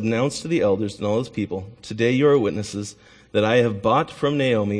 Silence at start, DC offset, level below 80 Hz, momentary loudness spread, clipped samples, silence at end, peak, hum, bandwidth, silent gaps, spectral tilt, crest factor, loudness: 0 s; under 0.1%; -56 dBFS; 12 LU; under 0.1%; 0 s; -6 dBFS; none; 10.5 kHz; none; -6 dB/octave; 16 dB; -21 LUFS